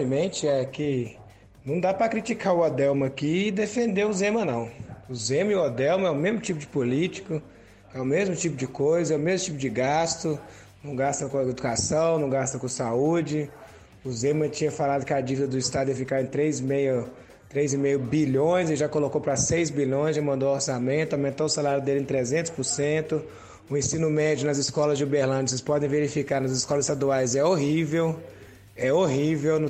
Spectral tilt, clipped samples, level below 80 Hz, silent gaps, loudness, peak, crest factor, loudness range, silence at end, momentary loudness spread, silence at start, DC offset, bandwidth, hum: -5 dB/octave; under 0.1%; -56 dBFS; none; -25 LUFS; -10 dBFS; 14 dB; 2 LU; 0 s; 8 LU; 0 s; under 0.1%; 10 kHz; none